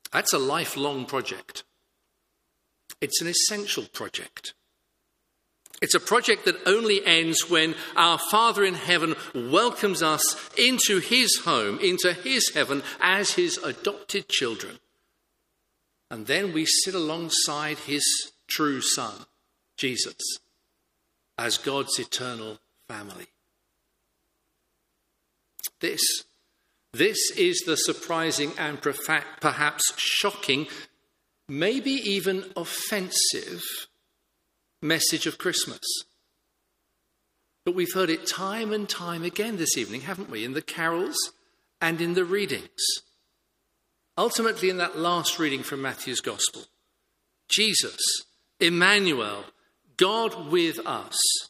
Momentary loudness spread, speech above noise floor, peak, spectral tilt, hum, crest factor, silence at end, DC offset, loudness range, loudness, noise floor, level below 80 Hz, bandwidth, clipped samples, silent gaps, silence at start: 13 LU; 50 dB; -2 dBFS; -2 dB/octave; none; 24 dB; 0 s; under 0.1%; 8 LU; -24 LUFS; -76 dBFS; -74 dBFS; 15.5 kHz; under 0.1%; none; 0.1 s